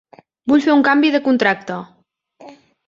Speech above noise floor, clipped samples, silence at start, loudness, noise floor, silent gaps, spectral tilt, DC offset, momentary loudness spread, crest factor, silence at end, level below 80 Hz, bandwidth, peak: 32 dB; under 0.1%; 0.45 s; -15 LUFS; -47 dBFS; none; -5.5 dB/octave; under 0.1%; 16 LU; 16 dB; 0.35 s; -62 dBFS; 7.4 kHz; -2 dBFS